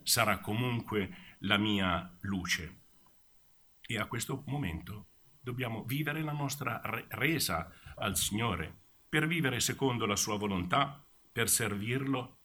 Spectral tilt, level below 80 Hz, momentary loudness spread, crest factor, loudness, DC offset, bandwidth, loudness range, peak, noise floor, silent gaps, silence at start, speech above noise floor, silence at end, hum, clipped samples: -3.5 dB/octave; -58 dBFS; 11 LU; 24 dB; -33 LUFS; under 0.1%; over 20 kHz; 7 LU; -10 dBFS; -64 dBFS; none; 0.05 s; 30 dB; 0.15 s; none; under 0.1%